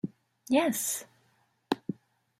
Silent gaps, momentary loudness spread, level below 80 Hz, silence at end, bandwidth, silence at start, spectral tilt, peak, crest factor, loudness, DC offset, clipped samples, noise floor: none; 15 LU; -76 dBFS; 0.45 s; 16 kHz; 0.05 s; -3.5 dB/octave; -10 dBFS; 22 dB; -31 LUFS; under 0.1%; under 0.1%; -70 dBFS